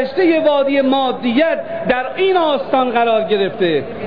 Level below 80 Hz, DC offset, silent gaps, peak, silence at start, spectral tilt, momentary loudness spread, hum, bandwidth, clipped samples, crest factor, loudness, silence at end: -54 dBFS; 1%; none; -4 dBFS; 0 s; -8 dB/octave; 4 LU; none; 5.2 kHz; under 0.1%; 12 dB; -15 LUFS; 0 s